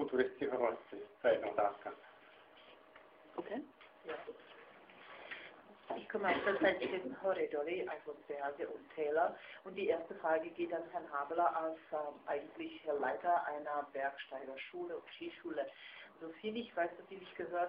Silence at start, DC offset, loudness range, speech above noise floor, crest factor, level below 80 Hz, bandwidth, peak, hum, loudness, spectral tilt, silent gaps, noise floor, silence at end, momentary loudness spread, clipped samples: 0 s; under 0.1%; 10 LU; 22 dB; 20 dB; -80 dBFS; 5.2 kHz; -20 dBFS; none; -39 LUFS; -2 dB/octave; none; -61 dBFS; 0 s; 19 LU; under 0.1%